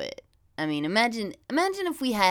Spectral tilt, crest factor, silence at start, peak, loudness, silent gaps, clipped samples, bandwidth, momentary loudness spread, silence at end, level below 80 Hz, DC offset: -4 dB/octave; 22 dB; 0 s; -6 dBFS; -27 LUFS; none; under 0.1%; 19 kHz; 14 LU; 0 s; -62 dBFS; under 0.1%